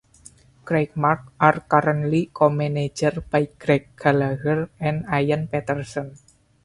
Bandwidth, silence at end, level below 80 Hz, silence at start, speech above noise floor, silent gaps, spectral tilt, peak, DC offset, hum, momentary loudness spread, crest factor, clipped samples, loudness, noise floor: 11.5 kHz; 0.5 s; -52 dBFS; 0.65 s; 29 dB; none; -7 dB/octave; 0 dBFS; under 0.1%; none; 7 LU; 22 dB; under 0.1%; -22 LUFS; -50 dBFS